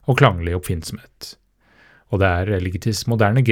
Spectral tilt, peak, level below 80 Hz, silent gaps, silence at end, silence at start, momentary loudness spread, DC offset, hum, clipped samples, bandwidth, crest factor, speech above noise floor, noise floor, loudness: -6 dB/octave; 0 dBFS; -44 dBFS; none; 0 s; 0.05 s; 19 LU; under 0.1%; none; under 0.1%; 18 kHz; 20 dB; 35 dB; -54 dBFS; -20 LUFS